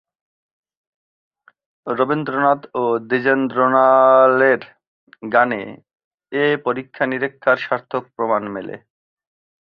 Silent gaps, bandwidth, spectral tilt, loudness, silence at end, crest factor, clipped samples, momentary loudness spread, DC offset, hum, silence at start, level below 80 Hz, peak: 4.87-5.07 s, 6.04-6.18 s; 5.4 kHz; -8.5 dB/octave; -17 LUFS; 0.95 s; 18 dB; under 0.1%; 16 LU; under 0.1%; none; 1.85 s; -66 dBFS; -2 dBFS